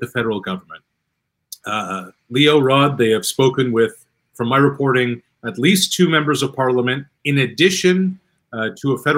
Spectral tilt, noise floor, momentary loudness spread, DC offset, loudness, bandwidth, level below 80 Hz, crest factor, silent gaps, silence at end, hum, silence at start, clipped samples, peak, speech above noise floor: -4.5 dB/octave; -74 dBFS; 14 LU; under 0.1%; -17 LUFS; 16 kHz; -62 dBFS; 18 dB; none; 0 s; none; 0 s; under 0.1%; 0 dBFS; 57 dB